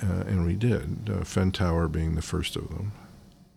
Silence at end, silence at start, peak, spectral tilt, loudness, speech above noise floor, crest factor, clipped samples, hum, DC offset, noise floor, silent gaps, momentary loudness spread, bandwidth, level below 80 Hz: 0.25 s; 0 s; -14 dBFS; -6.5 dB/octave; -28 LUFS; 25 dB; 14 dB; under 0.1%; none; under 0.1%; -52 dBFS; none; 10 LU; 14 kHz; -40 dBFS